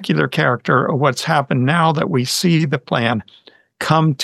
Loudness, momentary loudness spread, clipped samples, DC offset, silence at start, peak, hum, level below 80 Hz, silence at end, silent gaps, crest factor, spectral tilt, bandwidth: -17 LUFS; 4 LU; under 0.1%; under 0.1%; 0 s; 0 dBFS; none; -60 dBFS; 0 s; none; 16 dB; -5.5 dB/octave; 13.5 kHz